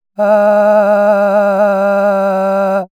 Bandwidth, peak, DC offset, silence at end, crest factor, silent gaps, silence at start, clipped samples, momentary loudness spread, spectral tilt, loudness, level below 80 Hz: 11 kHz; 0 dBFS; under 0.1%; 0.15 s; 10 dB; none; 0.2 s; under 0.1%; 4 LU; -7.5 dB/octave; -11 LUFS; -78 dBFS